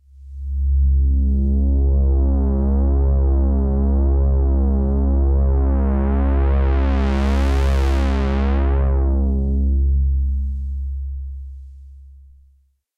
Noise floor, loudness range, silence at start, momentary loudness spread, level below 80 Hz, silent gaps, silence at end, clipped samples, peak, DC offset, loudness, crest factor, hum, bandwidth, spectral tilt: -57 dBFS; 4 LU; 0.2 s; 9 LU; -18 dBFS; none; 0.9 s; under 0.1%; -8 dBFS; under 0.1%; -19 LUFS; 8 dB; none; 4.9 kHz; -9 dB/octave